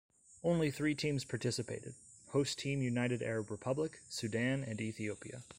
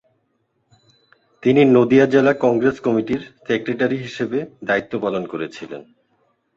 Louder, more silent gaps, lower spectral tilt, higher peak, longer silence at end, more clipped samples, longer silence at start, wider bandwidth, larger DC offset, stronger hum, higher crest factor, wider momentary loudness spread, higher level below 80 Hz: second, -37 LUFS vs -18 LUFS; neither; second, -5.5 dB/octave vs -7 dB/octave; second, -22 dBFS vs -2 dBFS; second, 0.05 s vs 0.75 s; neither; second, 0.3 s vs 1.4 s; first, 16 kHz vs 7.6 kHz; neither; neither; about the same, 16 dB vs 18 dB; second, 8 LU vs 15 LU; second, -68 dBFS vs -58 dBFS